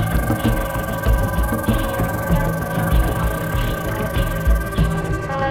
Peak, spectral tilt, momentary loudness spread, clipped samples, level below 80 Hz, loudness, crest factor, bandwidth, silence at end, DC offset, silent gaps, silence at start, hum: -4 dBFS; -6 dB/octave; 3 LU; under 0.1%; -22 dBFS; -21 LUFS; 14 dB; 17 kHz; 0 s; under 0.1%; none; 0 s; none